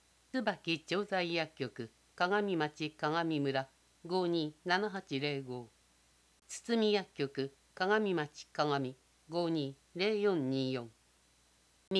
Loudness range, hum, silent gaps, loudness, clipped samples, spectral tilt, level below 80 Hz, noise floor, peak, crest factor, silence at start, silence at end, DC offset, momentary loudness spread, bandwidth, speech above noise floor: 2 LU; none; 11.87-11.91 s; -35 LUFS; under 0.1%; -5.5 dB/octave; -76 dBFS; -69 dBFS; -14 dBFS; 22 dB; 0.35 s; 0 s; under 0.1%; 11 LU; 11 kHz; 34 dB